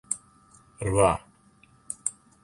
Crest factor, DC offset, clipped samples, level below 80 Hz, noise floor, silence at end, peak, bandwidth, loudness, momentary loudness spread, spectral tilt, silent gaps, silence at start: 24 dB; under 0.1%; under 0.1%; -48 dBFS; -59 dBFS; 0.3 s; -6 dBFS; 11.5 kHz; -27 LUFS; 12 LU; -4.5 dB/octave; none; 0.1 s